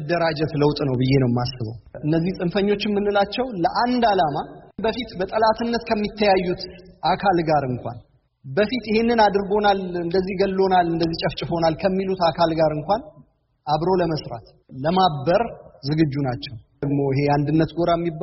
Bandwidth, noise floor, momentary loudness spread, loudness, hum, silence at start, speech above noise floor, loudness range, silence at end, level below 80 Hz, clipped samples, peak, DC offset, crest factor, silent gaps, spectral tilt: 6 kHz; -53 dBFS; 11 LU; -21 LUFS; none; 0 s; 33 dB; 2 LU; 0 s; -46 dBFS; under 0.1%; -4 dBFS; under 0.1%; 16 dB; none; -5 dB/octave